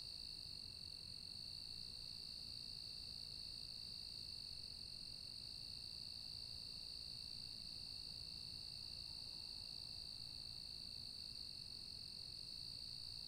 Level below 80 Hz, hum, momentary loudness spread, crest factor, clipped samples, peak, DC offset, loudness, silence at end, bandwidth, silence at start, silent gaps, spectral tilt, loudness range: -68 dBFS; none; 1 LU; 14 dB; under 0.1%; -40 dBFS; under 0.1%; -49 LUFS; 0 s; 16 kHz; 0 s; none; -2 dB/octave; 0 LU